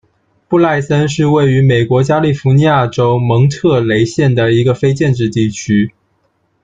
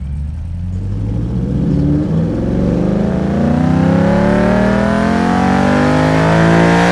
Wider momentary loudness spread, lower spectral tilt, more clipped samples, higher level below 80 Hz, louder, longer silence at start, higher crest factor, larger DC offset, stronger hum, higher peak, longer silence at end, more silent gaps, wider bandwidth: second, 4 LU vs 10 LU; about the same, -7 dB/octave vs -7.5 dB/octave; neither; second, -44 dBFS vs -26 dBFS; about the same, -12 LUFS vs -13 LUFS; first, 0.5 s vs 0 s; about the same, 10 dB vs 12 dB; neither; neither; about the same, -2 dBFS vs 0 dBFS; first, 0.75 s vs 0 s; neither; second, 7.8 kHz vs 12 kHz